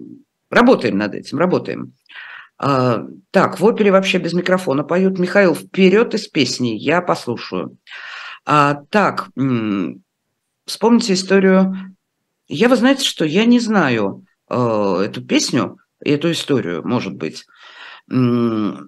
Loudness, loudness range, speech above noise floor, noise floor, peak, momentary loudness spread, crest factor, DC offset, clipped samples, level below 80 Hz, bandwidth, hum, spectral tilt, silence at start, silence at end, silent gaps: -16 LUFS; 4 LU; 57 dB; -73 dBFS; 0 dBFS; 15 LU; 18 dB; under 0.1%; under 0.1%; -62 dBFS; 12.5 kHz; none; -5.5 dB/octave; 0 s; 0 s; none